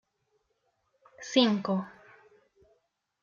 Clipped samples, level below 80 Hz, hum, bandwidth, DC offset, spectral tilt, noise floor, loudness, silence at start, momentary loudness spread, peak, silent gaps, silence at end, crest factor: under 0.1%; -78 dBFS; none; 7.4 kHz; under 0.1%; -5 dB/octave; -76 dBFS; -27 LUFS; 1.2 s; 21 LU; -10 dBFS; none; 1.35 s; 24 dB